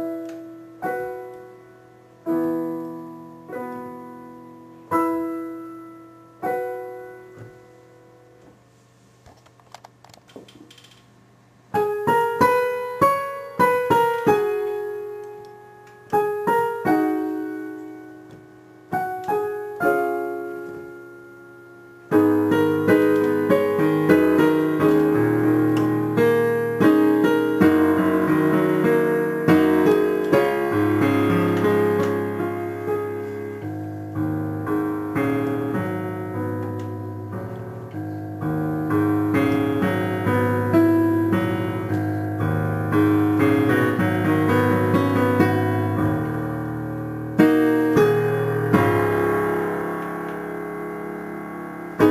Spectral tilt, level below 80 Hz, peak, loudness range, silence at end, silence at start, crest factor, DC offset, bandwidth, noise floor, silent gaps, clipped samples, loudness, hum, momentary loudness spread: -7.5 dB/octave; -56 dBFS; -2 dBFS; 11 LU; 0 s; 0 s; 20 dB; under 0.1%; 15.5 kHz; -54 dBFS; none; under 0.1%; -21 LUFS; none; 16 LU